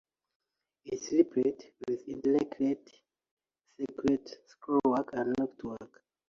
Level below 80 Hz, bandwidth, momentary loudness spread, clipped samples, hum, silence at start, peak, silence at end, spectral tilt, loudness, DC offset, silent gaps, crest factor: -68 dBFS; 7.4 kHz; 14 LU; under 0.1%; none; 0.85 s; -12 dBFS; 0.4 s; -6 dB/octave; -32 LUFS; under 0.1%; 3.31-3.37 s; 22 dB